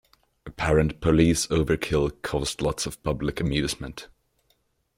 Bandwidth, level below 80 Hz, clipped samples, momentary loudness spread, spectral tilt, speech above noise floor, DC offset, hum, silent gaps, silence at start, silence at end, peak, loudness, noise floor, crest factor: 16.5 kHz; -40 dBFS; under 0.1%; 10 LU; -5 dB/octave; 45 dB; under 0.1%; none; none; 0.45 s; 0.9 s; -6 dBFS; -25 LUFS; -69 dBFS; 20 dB